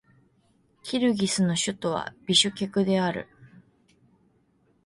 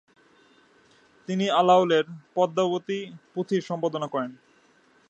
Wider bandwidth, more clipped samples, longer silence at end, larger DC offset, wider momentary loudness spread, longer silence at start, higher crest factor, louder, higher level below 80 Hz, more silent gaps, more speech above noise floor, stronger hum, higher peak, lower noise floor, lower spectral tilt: first, 11.5 kHz vs 8.2 kHz; neither; first, 1.4 s vs 0.75 s; neither; second, 12 LU vs 15 LU; second, 0.85 s vs 1.3 s; about the same, 22 dB vs 20 dB; about the same, -25 LUFS vs -25 LUFS; first, -64 dBFS vs -78 dBFS; neither; first, 41 dB vs 36 dB; neither; about the same, -8 dBFS vs -6 dBFS; first, -66 dBFS vs -61 dBFS; second, -4 dB/octave vs -6 dB/octave